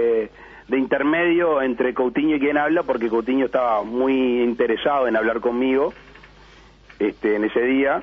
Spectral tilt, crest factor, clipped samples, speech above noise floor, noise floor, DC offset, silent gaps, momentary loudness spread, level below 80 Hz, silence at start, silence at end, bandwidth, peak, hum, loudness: -7.5 dB/octave; 14 dB; under 0.1%; 28 dB; -48 dBFS; under 0.1%; none; 5 LU; -52 dBFS; 0 s; 0 s; 6 kHz; -6 dBFS; none; -20 LUFS